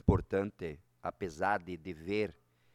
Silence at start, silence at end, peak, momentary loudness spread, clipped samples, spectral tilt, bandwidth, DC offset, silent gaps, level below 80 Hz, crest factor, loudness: 0.05 s; 0.4 s; -12 dBFS; 12 LU; under 0.1%; -7.5 dB/octave; 11.5 kHz; under 0.1%; none; -48 dBFS; 24 dB; -37 LUFS